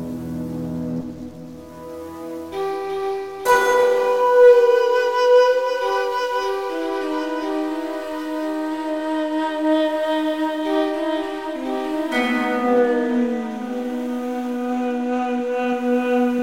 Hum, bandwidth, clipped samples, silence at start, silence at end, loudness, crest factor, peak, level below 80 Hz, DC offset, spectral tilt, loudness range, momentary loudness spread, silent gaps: none; 16.5 kHz; under 0.1%; 0 s; 0 s; -20 LUFS; 16 dB; -4 dBFS; -56 dBFS; 0.3%; -5 dB/octave; 8 LU; 13 LU; none